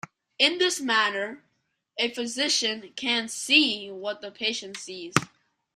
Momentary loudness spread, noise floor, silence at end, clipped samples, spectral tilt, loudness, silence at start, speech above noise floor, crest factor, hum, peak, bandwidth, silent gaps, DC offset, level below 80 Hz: 16 LU; -75 dBFS; 0.5 s; under 0.1%; -2 dB/octave; -25 LUFS; 0.4 s; 48 dB; 26 dB; none; -2 dBFS; 14.5 kHz; none; under 0.1%; -68 dBFS